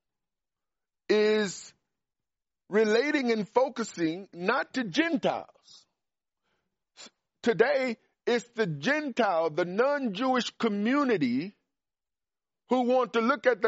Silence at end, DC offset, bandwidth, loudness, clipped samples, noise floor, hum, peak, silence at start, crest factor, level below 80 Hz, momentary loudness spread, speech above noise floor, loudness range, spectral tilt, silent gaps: 0 s; under 0.1%; 8 kHz; -28 LUFS; under 0.1%; under -90 dBFS; none; -8 dBFS; 1.1 s; 20 dB; -78 dBFS; 7 LU; over 63 dB; 4 LU; -3.5 dB/octave; none